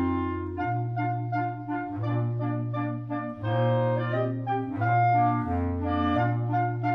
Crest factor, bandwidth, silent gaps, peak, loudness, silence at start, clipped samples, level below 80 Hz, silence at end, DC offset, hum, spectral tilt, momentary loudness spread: 12 dB; 5 kHz; none; -14 dBFS; -27 LUFS; 0 s; under 0.1%; -50 dBFS; 0 s; under 0.1%; none; -10.5 dB/octave; 7 LU